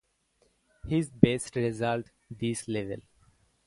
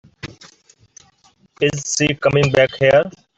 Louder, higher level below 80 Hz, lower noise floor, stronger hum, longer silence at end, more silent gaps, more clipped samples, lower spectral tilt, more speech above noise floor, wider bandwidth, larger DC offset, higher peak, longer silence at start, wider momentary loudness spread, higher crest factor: second, -29 LUFS vs -16 LUFS; second, -56 dBFS vs -50 dBFS; first, -70 dBFS vs -55 dBFS; neither; first, 0.65 s vs 0.3 s; neither; neither; first, -6 dB/octave vs -4.5 dB/octave; about the same, 42 dB vs 40 dB; first, 11.5 kHz vs 8.2 kHz; neither; about the same, 0 dBFS vs -2 dBFS; first, 0.85 s vs 0.25 s; second, 17 LU vs 21 LU; first, 30 dB vs 16 dB